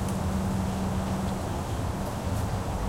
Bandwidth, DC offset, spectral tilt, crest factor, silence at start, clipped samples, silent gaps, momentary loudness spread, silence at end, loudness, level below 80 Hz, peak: 16 kHz; under 0.1%; -6.5 dB/octave; 12 dB; 0 s; under 0.1%; none; 3 LU; 0 s; -30 LUFS; -36 dBFS; -18 dBFS